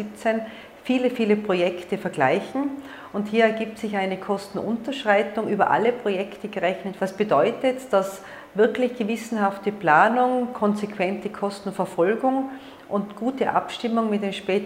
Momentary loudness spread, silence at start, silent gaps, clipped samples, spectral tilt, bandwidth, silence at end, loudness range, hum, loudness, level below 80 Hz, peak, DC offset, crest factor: 9 LU; 0 s; none; under 0.1%; -6 dB/octave; 16 kHz; 0 s; 3 LU; none; -24 LUFS; -66 dBFS; -4 dBFS; under 0.1%; 20 dB